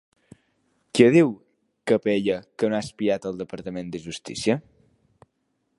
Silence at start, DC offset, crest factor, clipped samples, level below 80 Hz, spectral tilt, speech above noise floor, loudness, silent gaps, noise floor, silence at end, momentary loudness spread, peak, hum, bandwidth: 0.95 s; under 0.1%; 24 dB; under 0.1%; -62 dBFS; -6 dB/octave; 51 dB; -24 LUFS; none; -73 dBFS; 1.2 s; 17 LU; -2 dBFS; none; 11.5 kHz